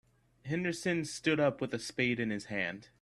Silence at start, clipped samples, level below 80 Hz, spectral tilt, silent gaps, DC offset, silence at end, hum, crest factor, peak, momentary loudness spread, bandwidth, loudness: 0.45 s; under 0.1%; -68 dBFS; -5 dB/octave; none; under 0.1%; 0.15 s; none; 20 dB; -14 dBFS; 8 LU; 12.5 kHz; -34 LUFS